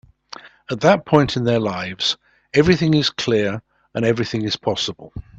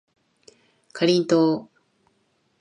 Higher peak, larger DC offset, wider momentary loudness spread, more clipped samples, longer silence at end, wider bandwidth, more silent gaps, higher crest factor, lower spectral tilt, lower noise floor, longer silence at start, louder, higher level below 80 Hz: first, 0 dBFS vs -6 dBFS; neither; first, 17 LU vs 12 LU; neither; second, 0.15 s vs 0.95 s; second, 8.2 kHz vs 10.5 kHz; neither; about the same, 20 dB vs 18 dB; about the same, -5.5 dB/octave vs -5.5 dB/octave; second, -41 dBFS vs -68 dBFS; second, 0.45 s vs 0.95 s; about the same, -19 LUFS vs -21 LUFS; first, -46 dBFS vs -72 dBFS